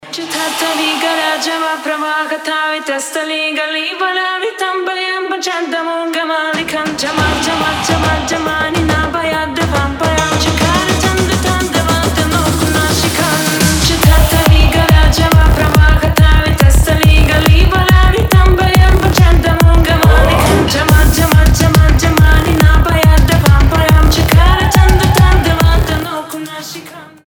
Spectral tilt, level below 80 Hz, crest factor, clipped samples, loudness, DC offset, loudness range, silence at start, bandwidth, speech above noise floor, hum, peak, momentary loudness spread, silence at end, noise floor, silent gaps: -5 dB/octave; -14 dBFS; 10 dB; 0.2%; -11 LUFS; under 0.1%; 7 LU; 0.05 s; over 20 kHz; 16 dB; none; 0 dBFS; 8 LU; 0.2 s; -32 dBFS; none